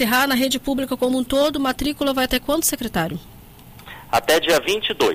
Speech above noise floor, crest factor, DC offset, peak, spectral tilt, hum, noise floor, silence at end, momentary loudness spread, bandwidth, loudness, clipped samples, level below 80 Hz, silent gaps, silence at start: 23 dB; 14 dB; under 0.1%; -6 dBFS; -3 dB/octave; none; -43 dBFS; 0 s; 7 LU; 16 kHz; -20 LUFS; under 0.1%; -42 dBFS; none; 0 s